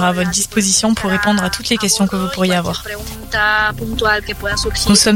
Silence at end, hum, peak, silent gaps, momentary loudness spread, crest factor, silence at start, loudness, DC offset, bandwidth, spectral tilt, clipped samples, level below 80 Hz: 0 s; none; 0 dBFS; none; 7 LU; 16 dB; 0 s; -15 LUFS; under 0.1%; 17 kHz; -3 dB/octave; under 0.1%; -32 dBFS